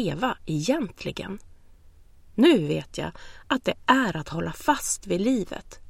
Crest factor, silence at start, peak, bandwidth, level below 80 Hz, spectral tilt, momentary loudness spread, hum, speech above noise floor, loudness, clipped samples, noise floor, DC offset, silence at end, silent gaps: 22 dB; 0 s; -4 dBFS; 16.5 kHz; -50 dBFS; -4.5 dB/octave; 16 LU; none; 26 dB; -25 LUFS; under 0.1%; -51 dBFS; under 0.1%; 0 s; none